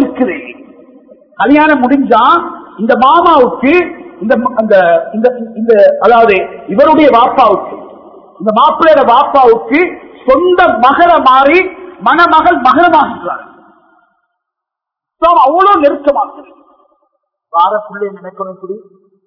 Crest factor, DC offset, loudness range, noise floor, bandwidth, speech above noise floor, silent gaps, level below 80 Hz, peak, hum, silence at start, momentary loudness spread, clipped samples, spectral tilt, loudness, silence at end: 10 dB; under 0.1%; 5 LU; -80 dBFS; 5.4 kHz; 72 dB; none; -44 dBFS; 0 dBFS; none; 0 s; 15 LU; 2%; -7 dB/octave; -8 LUFS; 0.5 s